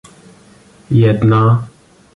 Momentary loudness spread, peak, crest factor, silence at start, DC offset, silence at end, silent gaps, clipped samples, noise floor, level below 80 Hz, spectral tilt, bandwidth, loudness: 7 LU; -2 dBFS; 14 dB; 0.9 s; under 0.1%; 0.5 s; none; under 0.1%; -45 dBFS; -44 dBFS; -9 dB/octave; 4.7 kHz; -13 LUFS